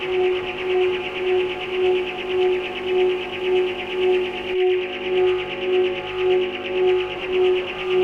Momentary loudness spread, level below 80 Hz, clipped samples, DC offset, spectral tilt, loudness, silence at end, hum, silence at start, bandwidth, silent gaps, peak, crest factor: 4 LU; -52 dBFS; under 0.1%; under 0.1%; -5.5 dB/octave; -22 LUFS; 0 s; 50 Hz at -50 dBFS; 0 s; 6.4 kHz; none; -10 dBFS; 12 dB